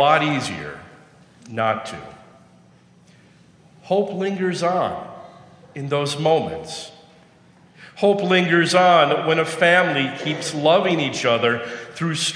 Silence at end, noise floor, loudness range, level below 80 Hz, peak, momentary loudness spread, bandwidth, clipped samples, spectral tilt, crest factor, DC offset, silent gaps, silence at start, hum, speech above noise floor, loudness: 0 s; -52 dBFS; 11 LU; -62 dBFS; 0 dBFS; 18 LU; 10.5 kHz; under 0.1%; -4.5 dB/octave; 20 dB; under 0.1%; none; 0 s; none; 32 dB; -19 LUFS